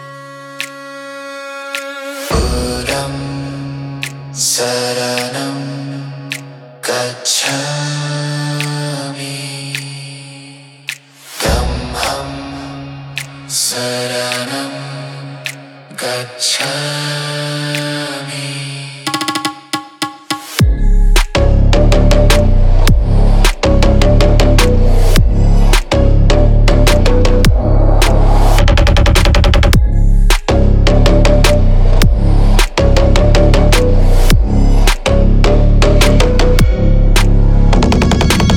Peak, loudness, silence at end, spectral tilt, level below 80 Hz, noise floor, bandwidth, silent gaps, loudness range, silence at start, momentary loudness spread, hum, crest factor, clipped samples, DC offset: 0 dBFS; -13 LUFS; 0 s; -5 dB/octave; -12 dBFS; -36 dBFS; 15.5 kHz; none; 9 LU; 0 s; 14 LU; none; 10 dB; under 0.1%; under 0.1%